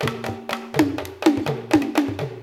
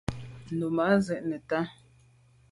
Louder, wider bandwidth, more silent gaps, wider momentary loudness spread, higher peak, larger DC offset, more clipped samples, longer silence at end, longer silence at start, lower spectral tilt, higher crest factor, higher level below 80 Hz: first, -23 LUFS vs -29 LUFS; first, 17 kHz vs 11.5 kHz; neither; second, 8 LU vs 13 LU; first, -4 dBFS vs -10 dBFS; neither; neither; second, 0 s vs 0.8 s; about the same, 0 s vs 0.1 s; second, -5.5 dB/octave vs -7 dB/octave; about the same, 18 dB vs 20 dB; about the same, -54 dBFS vs -54 dBFS